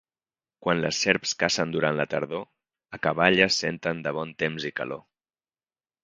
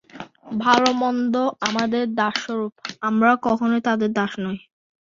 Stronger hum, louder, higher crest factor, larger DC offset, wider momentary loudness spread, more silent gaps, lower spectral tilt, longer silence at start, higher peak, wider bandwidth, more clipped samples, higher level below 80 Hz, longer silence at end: neither; second, -25 LUFS vs -21 LUFS; first, 26 dB vs 20 dB; neither; about the same, 13 LU vs 13 LU; neither; about the same, -3.5 dB/octave vs -4.5 dB/octave; first, 0.6 s vs 0.15 s; about the same, -2 dBFS vs -2 dBFS; first, 9.6 kHz vs 7.6 kHz; neither; about the same, -60 dBFS vs -62 dBFS; first, 1.05 s vs 0.45 s